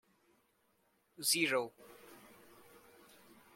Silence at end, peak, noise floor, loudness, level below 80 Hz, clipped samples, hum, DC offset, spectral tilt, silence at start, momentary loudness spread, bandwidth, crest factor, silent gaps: 1.35 s; -18 dBFS; -76 dBFS; -34 LUFS; -86 dBFS; under 0.1%; none; under 0.1%; -1.5 dB/octave; 1.2 s; 26 LU; 16.5 kHz; 24 dB; none